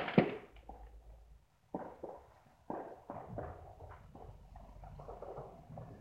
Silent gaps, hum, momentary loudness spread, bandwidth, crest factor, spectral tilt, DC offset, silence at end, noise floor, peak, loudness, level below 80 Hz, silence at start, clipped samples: none; none; 15 LU; 10.5 kHz; 32 dB; -8.5 dB/octave; under 0.1%; 0 s; -64 dBFS; -12 dBFS; -44 LUFS; -60 dBFS; 0 s; under 0.1%